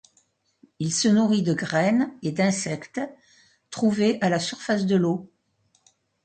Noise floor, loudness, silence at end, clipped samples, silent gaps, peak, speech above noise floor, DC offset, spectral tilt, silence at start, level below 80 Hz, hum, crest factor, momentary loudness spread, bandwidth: -68 dBFS; -24 LUFS; 1 s; under 0.1%; none; -10 dBFS; 45 dB; under 0.1%; -5 dB/octave; 0.8 s; -66 dBFS; none; 14 dB; 11 LU; 9.2 kHz